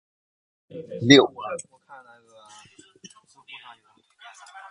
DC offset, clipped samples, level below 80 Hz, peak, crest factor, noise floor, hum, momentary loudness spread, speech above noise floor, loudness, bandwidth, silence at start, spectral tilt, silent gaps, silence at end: under 0.1%; under 0.1%; -62 dBFS; 0 dBFS; 26 dB; -58 dBFS; none; 29 LU; 38 dB; -19 LUFS; 11 kHz; 0.75 s; -4.5 dB/octave; none; 1.15 s